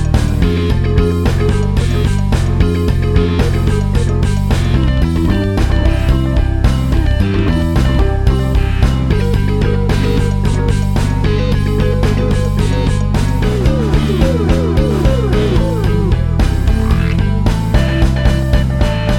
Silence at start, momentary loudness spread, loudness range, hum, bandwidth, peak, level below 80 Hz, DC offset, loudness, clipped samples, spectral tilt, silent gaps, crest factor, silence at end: 0 s; 2 LU; 1 LU; none; 15 kHz; 0 dBFS; -16 dBFS; under 0.1%; -14 LUFS; under 0.1%; -7 dB/octave; none; 12 dB; 0 s